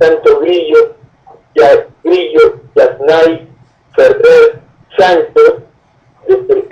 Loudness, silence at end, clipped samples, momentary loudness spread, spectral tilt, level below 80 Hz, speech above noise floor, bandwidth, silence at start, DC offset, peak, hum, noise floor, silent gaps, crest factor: -9 LUFS; 0.05 s; under 0.1%; 10 LU; -5.5 dB/octave; -48 dBFS; 42 dB; 7.8 kHz; 0 s; under 0.1%; 0 dBFS; none; -49 dBFS; none; 10 dB